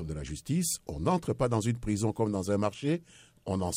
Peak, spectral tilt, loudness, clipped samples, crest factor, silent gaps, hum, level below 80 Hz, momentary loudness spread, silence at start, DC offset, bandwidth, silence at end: -14 dBFS; -5.5 dB/octave; -31 LUFS; under 0.1%; 18 dB; none; none; -50 dBFS; 7 LU; 0 s; under 0.1%; 16 kHz; 0 s